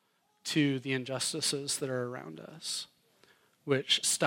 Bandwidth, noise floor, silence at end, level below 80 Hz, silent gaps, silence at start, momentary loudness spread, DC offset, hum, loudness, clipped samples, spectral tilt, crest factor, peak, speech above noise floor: 16.5 kHz; -66 dBFS; 0 s; -82 dBFS; none; 0.45 s; 16 LU; under 0.1%; none; -32 LUFS; under 0.1%; -3 dB/octave; 20 dB; -12 dBFS; 33 dB